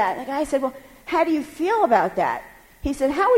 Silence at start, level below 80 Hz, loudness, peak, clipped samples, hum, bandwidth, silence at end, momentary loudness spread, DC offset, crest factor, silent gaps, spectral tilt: 0 s; -46 dBFS; -23 LUFS; -6 dBFS; under 0.1%; none; 16.5 kHz; 0 s; 11 LU; under 0.1%; 16 dB; none; -5 dB/octave